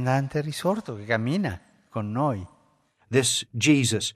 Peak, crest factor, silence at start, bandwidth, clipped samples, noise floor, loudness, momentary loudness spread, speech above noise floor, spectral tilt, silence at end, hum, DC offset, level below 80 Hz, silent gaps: -8 dBFS; 18 dB; 0 s; 14.5 kHz; under 0.1%; -64 dBFS; -25 LUFS; 13 LU; 40 dB; -4.5 dB/octave; 0.05 s; none; under 0.1%; -60 dBFS; none